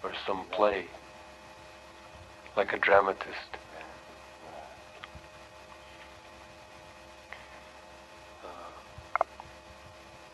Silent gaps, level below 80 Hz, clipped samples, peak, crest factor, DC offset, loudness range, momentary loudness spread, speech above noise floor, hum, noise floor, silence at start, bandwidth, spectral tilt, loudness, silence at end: none; -62 dBFS; under 0.1%; -8 dBFS; 28 dB; under 0.1%; 18 LU; 22 LU; 23 dB; none; -51 dBFS; 0 s; 12 kHz; -4 dB/octave; -30 LUFS; 0 s